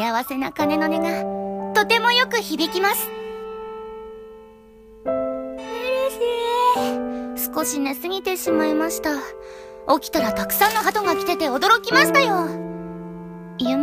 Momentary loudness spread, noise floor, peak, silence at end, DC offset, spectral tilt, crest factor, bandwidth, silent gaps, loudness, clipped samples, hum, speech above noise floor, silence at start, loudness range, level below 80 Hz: 18 LU; -46 dBFS; -2 dBFS; 0 s; under 0.1%; -3 dB/octave; 20 dB; 15.5 kHz; none; -21 LUFS; under 0.1%; none; 25 dB; 0 s; 7 LU; -54 dBFS